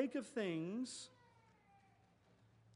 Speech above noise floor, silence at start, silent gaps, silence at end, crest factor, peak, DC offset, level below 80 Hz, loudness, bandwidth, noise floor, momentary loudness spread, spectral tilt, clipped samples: 29 dB; 0 s; none; 1.65 s; 20 dB; -26 dBFS; under 0.1%; -86 dBFS; -44 LUFS; 11 kHz; -72 dBFS; 11 LU; -5 dB/octave; under 0.1%